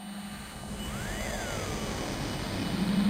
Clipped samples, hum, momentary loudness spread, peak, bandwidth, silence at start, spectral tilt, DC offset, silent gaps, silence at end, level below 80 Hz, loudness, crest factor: under 0.1%; none; 9 LU; -16 dBFS; 16 kHz; 0 s; -4.5 dB/octave; under 0.1%; none; 0 s; -44 dBFS; -34 LUFS; 16 dB